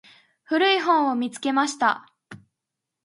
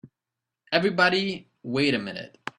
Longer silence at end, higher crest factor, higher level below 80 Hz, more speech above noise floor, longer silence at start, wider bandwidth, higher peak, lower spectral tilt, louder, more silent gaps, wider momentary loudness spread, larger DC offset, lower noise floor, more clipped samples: first, 0.65 s vs 0.1 s; second, 18 dB vs 24 dB; second, -78 dBFS vs -66 dBFS; about the same, 63 dB vs 63 dB; first, 0.5 s vs 0.05 s; about the same, 11.5 kHz vs 11 kHz; about the same, -6 dBFS vs -4 dBFS; second, -2.5 dB/octave vs -5 dB/octave; about the same, -22 LUFS vs -24 LUFS; neither; second, 7 LU vs 15 LU; neither; about the same, -84 dBFS vs -87 dBFS; neither